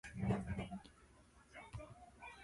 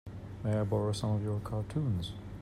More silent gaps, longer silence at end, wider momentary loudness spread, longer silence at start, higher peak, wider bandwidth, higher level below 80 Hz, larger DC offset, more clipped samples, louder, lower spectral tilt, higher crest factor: neither; about the same, 0 s vs 0 s; first, 25 LU vs 8 LU; about the same, 0.05 s vs 0.05 s; second, -26 dBFS vs -18 dBFS; about the same, 11.5 kHz vs 12 kHz; second, -58 dBFS vs -52 dBFS; neither; neither; second, -46 LUFS vs -34 LUFS; about the same, -7 dB/octave vs -7.5 dB/octave; first, 22 dB vs 16 dB